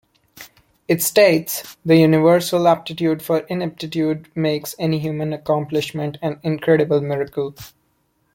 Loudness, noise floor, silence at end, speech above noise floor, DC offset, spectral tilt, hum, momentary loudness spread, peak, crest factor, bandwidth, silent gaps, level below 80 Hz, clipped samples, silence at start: -19 LUFS; -65 dBFS; 0.65 s; 47 dB; under 0.1%; -5.5 dB/octave; none; 11 LU; -2 dBFS; 18 dB; 17 kHz; none; -58 dBFS; under 0.1%; 0.35 s